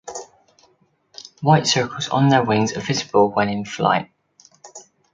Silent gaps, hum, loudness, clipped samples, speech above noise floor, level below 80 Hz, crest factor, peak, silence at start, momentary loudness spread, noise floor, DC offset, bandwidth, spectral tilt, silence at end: none; none; -19 LUFS; under 0.1%; 43 dB; -58 dBFS; 20 dB; -2 dBFS; 0.05 s; 19 LU; -61 dBFS; under 0.1%; 9.4 kHz; -5 dB/octave; 0.3 s